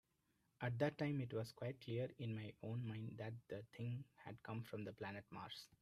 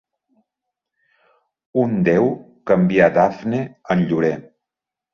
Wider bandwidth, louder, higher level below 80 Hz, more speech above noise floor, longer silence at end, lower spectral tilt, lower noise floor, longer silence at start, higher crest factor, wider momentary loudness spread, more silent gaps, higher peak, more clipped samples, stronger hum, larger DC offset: first, 13.5 kHz vs 6.8 kHz; second, -48 LUFS vs -18 LUFS; second, -80 dBFS vs -56 dBFS; second, 36 dB vs 69 dB; second, 0.05 s vs 0.7 s; about the same, -7.5 dB/octave vs -8.5 dB/octave; about the same, -84 dBFS vs -86 dBFS; second, 0.6 s vs 1.75 s; about the same, 22 dB vs 18 dB; about the same, 11 LU vs 11 LU; neither; second, -26 dBFS vs -2 dBFS; neither; neither; neither